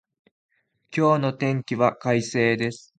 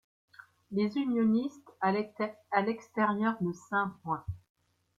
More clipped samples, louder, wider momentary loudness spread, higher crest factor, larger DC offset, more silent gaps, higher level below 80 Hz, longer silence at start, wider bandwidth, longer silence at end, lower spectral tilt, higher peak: neither; first, -23 LUFS vs -32 LUFS; second, 5 LU vs 9 LU; about the same, 20 dB vs 20 dB; neither; neither; about the same, -64 dBFS vs -64 dBFS; first, 0.9 s vs 0.7 s; first, 9.4 kHz vs 7.6 kHz; second, 0.2 s vs 0.6 s; second, -6 dB/octave vs -7.5 dB/octave; first, -4 dBFS vs -14 dBFS